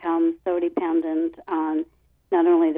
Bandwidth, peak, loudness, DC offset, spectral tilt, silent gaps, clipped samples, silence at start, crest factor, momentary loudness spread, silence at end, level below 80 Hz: 3.7 kHz; -8 dBFS; -23 LUFS; under 0.1%; -8 dB/octave; none; under 0.1%; 0 s; 14 dB; 7 LU; 0 s; -64 dBFS